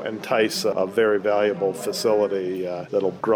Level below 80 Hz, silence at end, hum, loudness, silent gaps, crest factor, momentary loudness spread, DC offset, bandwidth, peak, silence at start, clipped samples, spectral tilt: -72 dBFS; 0 s; none; -22 LUFS; none; 14 dB; 5 LU; under 0.1%; 19.5 kHz; -8 dBFS; 0 s; under 0.1%; -4 dB/octave